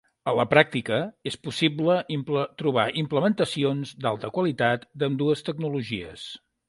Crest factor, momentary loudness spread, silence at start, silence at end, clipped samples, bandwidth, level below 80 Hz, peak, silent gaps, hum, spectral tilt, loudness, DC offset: 24 dB; 11 LU; 0.25 s; 0.3 s; under 0.1%; 11.5 kHz; -62 dBFS; -2 dBFS; none; none; -6 dB/octave; -25 LUFS; under 0.1%